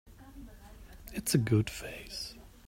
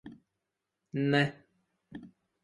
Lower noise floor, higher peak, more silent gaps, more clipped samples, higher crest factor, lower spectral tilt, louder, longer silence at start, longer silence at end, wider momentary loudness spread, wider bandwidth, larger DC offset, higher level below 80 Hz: second, -51 dBFS vs -86 dBFS; about the same, -12 dBFS vs -12 dBFS; neither; neither; about the same, 22 dB vs 24 dB; second, -5 dB/octave vs -7 dB/octave; second, -33 LUFS vs -30 LUFS; about the same, 0.05 s vs 0.05 s; second, 0.2 s vs 0.35 s; about the same, 25 LU vs 23 LU; first, 16 kHz vs 11 kHz; neither; first, -52 dBFS vs -70 dBFS